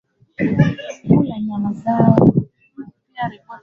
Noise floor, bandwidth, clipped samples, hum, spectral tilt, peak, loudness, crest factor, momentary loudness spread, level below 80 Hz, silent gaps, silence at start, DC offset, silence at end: -38 dBFS; 6.8 kHz; under 0.1%; none; -9 dB/octave; 0 dBFS; -17 LUFS; 18 dB; 24 LU; -46 dBFS; none; 0.4 s; under 0.1%; 0.05 s